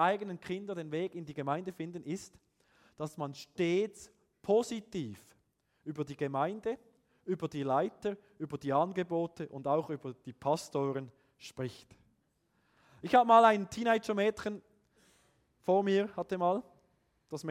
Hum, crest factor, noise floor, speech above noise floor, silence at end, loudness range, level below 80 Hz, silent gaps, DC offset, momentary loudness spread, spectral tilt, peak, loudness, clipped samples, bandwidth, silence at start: none; 24 dB; -76 dBFS; 43 dB; 0 s; 8 LU; -74 dBFS; none; under 0.1%; 16 LU; -6 dB/octave; -10 dBFS; -33 LUFS; under 0.1%; 15 kHz; 0 s